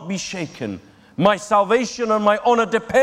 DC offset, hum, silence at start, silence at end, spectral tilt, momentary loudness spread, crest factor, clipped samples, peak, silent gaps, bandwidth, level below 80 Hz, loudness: under 0.1%; none; 0 s; 0 s; -4.5 dB/octave; 14 LU; 16 dB; under 0.1%; -2 dBFS; none; 12.5 kHz; -56 dBFS; -19 LUFS